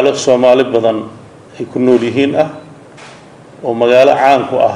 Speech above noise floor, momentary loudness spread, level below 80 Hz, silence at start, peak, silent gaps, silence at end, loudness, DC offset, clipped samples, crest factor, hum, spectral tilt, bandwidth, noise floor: 26 dB; 15 LU; -56 dBFS; 0 s; 0 dBFS; none; 0 s; -11 LUFS; under 0.1%; 0.3%; 12 dB; none; -5 dB/octave; 10.5 kHz; -37 dBFS